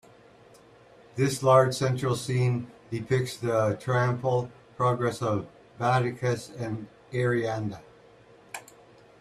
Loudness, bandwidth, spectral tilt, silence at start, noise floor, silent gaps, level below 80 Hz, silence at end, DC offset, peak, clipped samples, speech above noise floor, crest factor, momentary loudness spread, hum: -27 LUFS; 13 kHz; -6 dB/octave; 1.15 s; -54 dBFS; none; -62 dBFS; 0.6 s; under 0.1%; -8 dBFS; under 0.1%; 29 dB; 20 dB; 16 LU; none